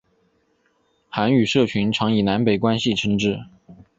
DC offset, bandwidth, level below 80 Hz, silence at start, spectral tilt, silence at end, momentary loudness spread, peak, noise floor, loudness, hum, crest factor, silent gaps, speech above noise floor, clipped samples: under 0.1%; 7.8 kHz; -52 dBFS; 1.15 s; -6 dB/octave; 0.25 s; 6 LU; -4 dBFS; -65 dBFS; -20 LUFS; none; 18 dB; none; 45 dB; under 0.1%